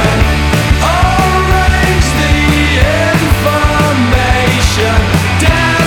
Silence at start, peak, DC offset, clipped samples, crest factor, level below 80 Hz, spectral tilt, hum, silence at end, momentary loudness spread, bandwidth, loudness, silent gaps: 0 s; 0 dBFS; under 0.1%; under 0.1%; 10 dB; -16 dBFS; -5 dB/octave; none; 0 s; 1 LU; 18.5 kHz; -10 LUFS; none